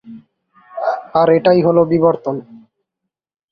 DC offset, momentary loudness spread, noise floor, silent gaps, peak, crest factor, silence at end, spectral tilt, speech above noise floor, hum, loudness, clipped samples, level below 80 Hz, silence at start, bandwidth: under 0.1%; 13 LU; -80 dBFS; none; -2 dBFS; 16 dB; 0.95 s; -9.5 dB/octave; 67 dB; none; -14 LUFS; under 0.1%; -58 dBFS; 0.05 s; 5.6 kHz